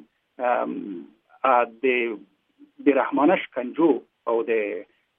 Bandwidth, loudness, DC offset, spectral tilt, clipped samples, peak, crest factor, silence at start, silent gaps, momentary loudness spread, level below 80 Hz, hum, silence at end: 3.8 kHz; -23 LUFS; under 0.1%; -9.5 dB/octave; under 0.1%; -6 dBFS; 18 dB; 0.4 s; none; 12 LU; -82 dBFS; none; 0.35 s